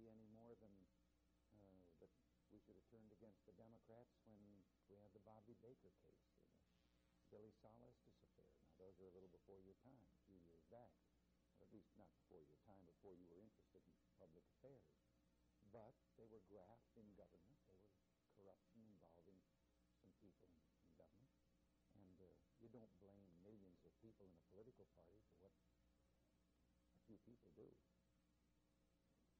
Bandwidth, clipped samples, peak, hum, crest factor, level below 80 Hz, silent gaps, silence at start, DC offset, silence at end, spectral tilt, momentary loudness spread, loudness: 4.6 kHz; under 0.1%; -54 dBFS; none; 18 dB; -86 dBFS; none; 0 s; under 0.1%; 0 s; -7.5 dB/octave; 2 LU; -69 LUFS